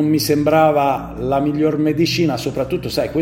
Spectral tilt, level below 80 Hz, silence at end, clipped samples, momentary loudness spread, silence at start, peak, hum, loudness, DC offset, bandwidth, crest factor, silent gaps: -6 dB/octave; -42 dBFS; 0 s; under 0.1%; 8 LU; 0 s; -2 dBFS; none; -17 LUFS; under 0.1%; 16.5 kHz; 16 dB; none